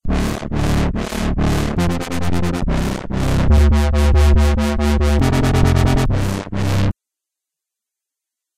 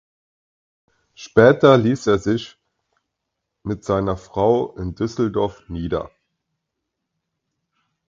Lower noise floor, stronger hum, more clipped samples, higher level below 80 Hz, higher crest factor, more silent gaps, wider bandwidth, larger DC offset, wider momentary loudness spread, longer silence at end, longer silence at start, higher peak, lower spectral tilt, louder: first, -84 dBFS vs -79 dBFS; neither; neither; first, -20 dBFS vs -46 dBFS; second, 14 dB vs 22 dB; neither; first, 15 kHz vs 7.6 kHz; neither; second, 8 LU vs 16 LU; second, 1.65 s vs 2.05 s; second, 0.05 s vs 1.2 s; about the same, 0 dBFS vs 0 dBFS; about the same, -6.5 dB/octave vs -7 dB/octave; about the same, -17 LUFS vs -19 LUFS